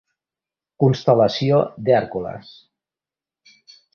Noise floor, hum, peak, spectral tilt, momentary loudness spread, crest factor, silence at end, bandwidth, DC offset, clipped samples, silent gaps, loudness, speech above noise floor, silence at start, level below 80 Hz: under -90 dBFS; none; -2 dBFS; -7.5 dB/octave; 13 LU; 20 dB; 1.55 s; 6.8 kHz; under 0.1%; under 0.1%; none; -19 LUFS; over 72 dB; 0.8 s; -56 dBFS